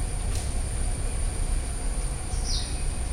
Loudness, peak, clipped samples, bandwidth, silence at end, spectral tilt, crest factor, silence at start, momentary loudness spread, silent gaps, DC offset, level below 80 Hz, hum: -31 LUFS; -14 dBFS; under 0.1%; 13.5 kHz; 0 s; -3.5 dB/octave; 12 dB; 0 s; 3 LU; none; under 0.1%; -28 dBFS; none